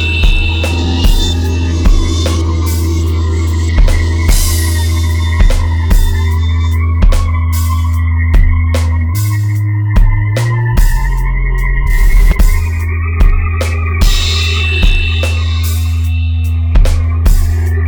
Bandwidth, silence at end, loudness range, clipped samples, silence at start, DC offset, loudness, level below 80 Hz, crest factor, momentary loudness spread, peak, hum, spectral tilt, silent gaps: 19.5 kHz; 0 s; 1 LU; under 0.1%; 0 s; under 0.1%; -13 LUFS; -12 dBFS; 10 dB; 3 LU; 0 dBFS; none; -5 dB/octave; none